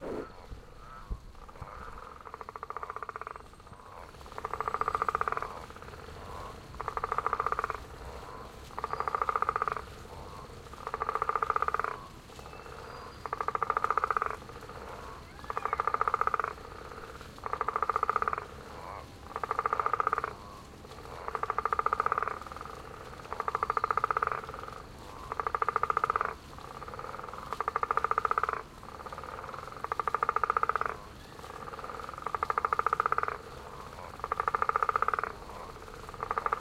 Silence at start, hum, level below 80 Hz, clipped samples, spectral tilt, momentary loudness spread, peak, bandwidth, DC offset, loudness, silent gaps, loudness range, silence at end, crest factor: 0 s; none; -52 dBFS; under 0.1%; -4.5 dB/octave; 17 LU; -12 dBFS; 16 kHz; under 0.1%; -33 LUFS; none; 4 LU; 0 s; 24 dB